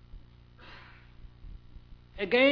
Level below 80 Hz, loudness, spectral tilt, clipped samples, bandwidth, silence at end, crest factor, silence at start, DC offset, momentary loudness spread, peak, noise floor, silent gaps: -52 dBFS; -28 LUFS; -6.5 dB/octave; under 0.1%; 5.4 kHz; 0 s; 22 dB; 0.15 s; under 0.1%; 27 LU; -10 dBFS; -53 dBFS; none